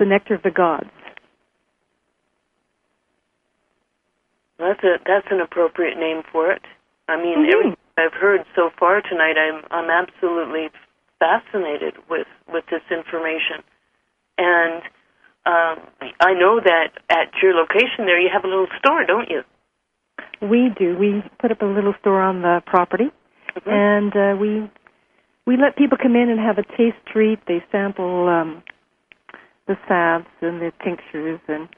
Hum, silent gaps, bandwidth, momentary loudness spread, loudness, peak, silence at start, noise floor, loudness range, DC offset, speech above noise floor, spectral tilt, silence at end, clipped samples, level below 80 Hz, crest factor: none; none; 5.8 kHz; 12 LU; -19 LUFS; 0 dBFS; 0 s; -73 dBFS; 6 LU; under 0.1%; 55 dB; -7.5 dB/octave; 0.1 s; under 0.1%; -64 dBFS; 20 dB